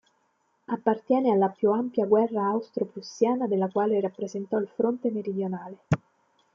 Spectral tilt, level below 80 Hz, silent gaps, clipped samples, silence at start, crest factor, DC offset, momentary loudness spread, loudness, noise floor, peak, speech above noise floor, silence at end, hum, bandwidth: -8 dB/octave; -66 dBFS; none; under 0.1%; 0.7 s; 18 dB; under 0.1%; 9 LU; -27 LUFS; -71 dBFS; -8 dBFS; 45 dB; 0.6 s; none; 7.4 kHz